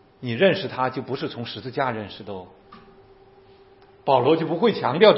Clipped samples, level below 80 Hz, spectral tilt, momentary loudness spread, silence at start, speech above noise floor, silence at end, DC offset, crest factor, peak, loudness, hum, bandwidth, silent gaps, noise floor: under 0.1%; -64 dBFS; -10 dB/octave; 15 LU; 0.2 s; 30 dB; 0 s; under 0.1%; 22 dB; 0 dBFS; -23 LUFS; none; 5.8 kHz; none; -52 dBFS